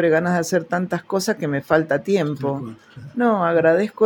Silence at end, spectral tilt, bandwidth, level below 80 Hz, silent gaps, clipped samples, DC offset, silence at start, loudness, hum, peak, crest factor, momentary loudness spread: 0 s; -6 dB/octave; 17 kHz; -62 dBFS; none; under 0.1%; under 0.1%; 0 s; -20 LUFS; none; -2 dBFS; 18 dB; 11 LU